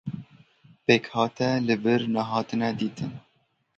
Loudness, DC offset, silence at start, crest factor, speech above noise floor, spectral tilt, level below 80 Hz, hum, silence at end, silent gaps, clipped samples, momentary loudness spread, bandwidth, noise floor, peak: -26 LUFS; under 0.1%; 0.05 s; 22 dB; 45 dB; -6 dB/octave; -64 dBFS; none; 0.6 s; none; under 0.1%; 14 LU; 7.6 kHz; -70 dBFS; -4 dBFS